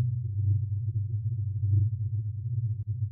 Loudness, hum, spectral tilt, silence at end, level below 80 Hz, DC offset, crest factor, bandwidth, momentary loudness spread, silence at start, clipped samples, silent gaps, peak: -30 LUFS; none; -22.5 dB/octave; 0 s; -54 dBFS; under 0.1%; 12 dB; 0.4 kHz; 6 LU; 0 s; under 0.1%; none; -16 dBFS